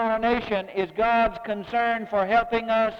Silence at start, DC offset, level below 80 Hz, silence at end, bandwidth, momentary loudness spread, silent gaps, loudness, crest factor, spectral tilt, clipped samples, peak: 0 s; under 0.1%; -48 dBFS; 0 s; 6.6 kHz; 6 LU; none; -24 LUFS; 16 dB; -6.5 dB/octave; under 0.1%; -8 dBFS